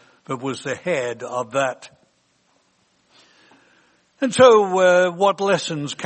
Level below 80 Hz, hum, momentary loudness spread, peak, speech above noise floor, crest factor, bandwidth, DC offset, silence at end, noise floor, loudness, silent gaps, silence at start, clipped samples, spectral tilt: -66 dBFS; none; 15 LU; 0 dBFS; 45 dB; 20 dB; 8.8 kHz; under 0.1%; 0 s; -63 dBFS; -19 LUFS; none; 0.3 s; under 0.1%; -4 dB/octave